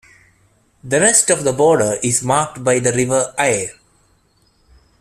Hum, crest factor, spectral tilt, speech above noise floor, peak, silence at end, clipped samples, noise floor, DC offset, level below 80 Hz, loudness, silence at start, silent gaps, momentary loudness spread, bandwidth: none; 18 dB; -3.5 dB/octave; 42 dB; 0 dBFS; 1.3 s; under 0.1%; -58 dBFS; under 0.1%; -52 dBFS; -15 LUFS; 0.85 s; none; 6 LU; 14.5 kHz